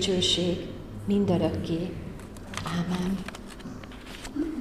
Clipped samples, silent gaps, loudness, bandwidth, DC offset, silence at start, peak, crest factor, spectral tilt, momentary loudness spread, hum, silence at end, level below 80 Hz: under 0.1%; none; -29 LUFS; 14.5 kHz; 0.1%; 0 s; -12 dBFS; 16 dB; -5 dB/octave; 17 LU; none; 0 s; -46 dBFS